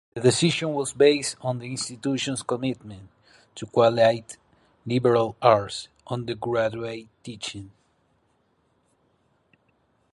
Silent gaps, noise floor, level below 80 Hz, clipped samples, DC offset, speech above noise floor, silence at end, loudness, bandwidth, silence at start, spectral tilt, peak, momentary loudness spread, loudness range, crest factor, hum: none; -68 dBFS; -62 dBFS; under 0.1%; under 0.1%; 44 dB; 2.45 s; -24 LUFS; 11.5 kHz; 0.15 s; -4.5 dB/octave; -4 dBFS; 20 LU; 10 LU; 22 dB; none